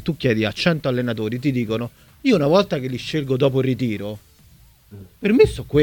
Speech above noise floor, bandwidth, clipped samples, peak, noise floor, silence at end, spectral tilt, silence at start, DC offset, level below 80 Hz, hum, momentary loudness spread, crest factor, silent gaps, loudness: 31 dB; 19 kHz; under 0.1%; -2 dBFS; -50 dBFS; 0 s; -7 dB/octave; 0 s; under 0.1%; -44 dBFS; none; 10 LU; 18 dB; none; -20 LUFS